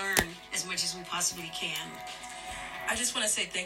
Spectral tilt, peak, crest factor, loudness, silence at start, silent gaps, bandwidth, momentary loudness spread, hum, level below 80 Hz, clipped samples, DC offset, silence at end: -0.5 dB/octave; -6 dBFS; 28 dB; -31 LUFS; 0 s; none; 16.5 kHz; 12 LU; none; -56 dBFS; under 0.1%; under 0.1%; 0 s